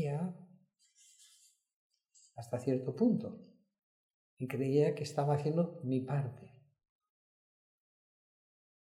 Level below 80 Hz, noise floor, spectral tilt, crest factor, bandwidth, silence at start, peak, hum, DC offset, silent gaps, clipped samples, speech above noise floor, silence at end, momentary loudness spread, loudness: -82 dBFS; -69 dBFS; -8 dB/octave; 20 dB; 13 kHz; 0 s; -18 dBFS; none; under 0.1%; 1.73-1.90 s, 3.83-4.37 s; under 0.1%; 35 dB; 2.35 s; 20 LU; -35 LUFS